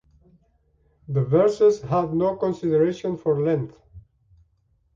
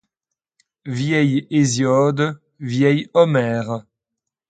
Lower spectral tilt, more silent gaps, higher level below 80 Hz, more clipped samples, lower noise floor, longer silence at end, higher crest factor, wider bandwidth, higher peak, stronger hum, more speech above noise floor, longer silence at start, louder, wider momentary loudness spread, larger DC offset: first, -8.5 dB/octave vs -6 dB/octave; neither; about the same, -56 dBFS vs -60 dBFS; neither; second, -66 dBFS vs -84 dBFS; first, 0.95 s vs 0.7 s; about the same, 16 dB vs 18 dB; second, 7.6 kHz vs 9.2 kHz; second, -8 dBFS vs -2 dBFS; neither; second, 45 dB vs 66 dB; first, 1.1 s vs 0.85 s; second, -22 LUFS vs -18 LUFS; second, 8 LU vs 13 LU; neither